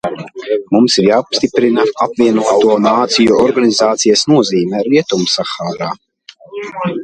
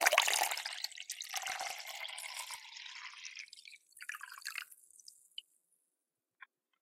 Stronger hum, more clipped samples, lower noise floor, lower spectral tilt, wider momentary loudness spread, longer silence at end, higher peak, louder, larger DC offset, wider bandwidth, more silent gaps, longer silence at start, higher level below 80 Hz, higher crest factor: neither; neither; second, -38 dBFS vs -89 dBFS; first, -4 dB/octave vs 3.5 dB/octave; second, 12 LU vs 20 LU; second, 0 s vs 0.4 s; first, 0 dBFS vs -8 dBFS; first, -12 LUFS vs -38 LUFS; neither; second, 9.8 kHz vs 17 kHz; neither; about the same, 0.05 s vs 0 s; first, -52 dBFS vs under -90 dBFS; second, 12 dB vs 32 dB